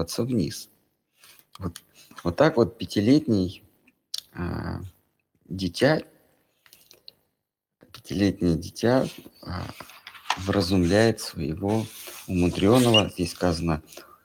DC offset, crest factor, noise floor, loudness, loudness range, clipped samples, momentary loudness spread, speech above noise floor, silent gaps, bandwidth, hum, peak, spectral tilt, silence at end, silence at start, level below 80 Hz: under 0.1%; 22 dB; -83 dBFS; -24 LUFS; 7 LU; under 0.1%; 18 LU; 58 dB; none; 17.5 kHz; none; -4 dBFS; -5.5 dB/octave; 0.2 s; 0 s; -48 dBFS